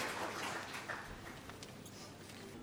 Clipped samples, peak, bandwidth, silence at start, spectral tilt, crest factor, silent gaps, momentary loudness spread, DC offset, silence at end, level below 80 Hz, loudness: under 0.1%; -26 dBFS; over 20 kHz; 0 s; -3 dB/octave; 20 dB; none; 10 LU; under 0.1%; 0 s; -66 dBFS; -46 LUFS